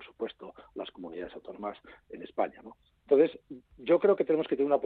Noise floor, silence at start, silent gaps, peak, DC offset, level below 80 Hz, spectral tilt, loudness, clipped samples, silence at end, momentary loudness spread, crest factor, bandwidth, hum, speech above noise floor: -48 dBFS; 0 s; none; -12 dBFS; under 0.1%; -68 dBFS; -9 dB/octave; -29 LUFS; under 0.1%; 0 s; 23 LU; 20 dB; 4.5 kHz; none; 20 dB